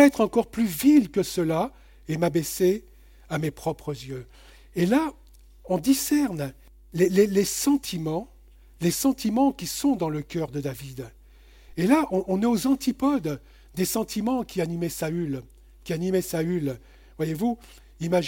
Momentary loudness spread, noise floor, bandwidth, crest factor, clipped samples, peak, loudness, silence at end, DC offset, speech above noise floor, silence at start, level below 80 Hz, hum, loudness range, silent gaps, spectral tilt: 14 LU; -51 dBFS; 17 kHz; 22 dB; under 0.1%; -4 dBFS; -25 LUFS; 0 s; under 0.1%; 27 dB; 0 s; -52 dBFS; none; 4 LU; none; -5.5 dB/octave